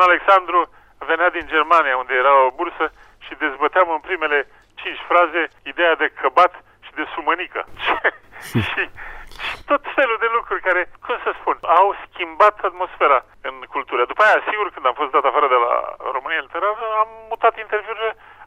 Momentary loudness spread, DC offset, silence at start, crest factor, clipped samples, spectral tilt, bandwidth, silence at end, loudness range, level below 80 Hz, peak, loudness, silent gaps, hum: 13 LU; under 0.1%; 0 s; 16 dB; under 0.1%; -5 dB/octave; 14.5 kHz; 0 s; 4 LU; -50 dBFS; -2 dBFS; -19 LUFS; none; none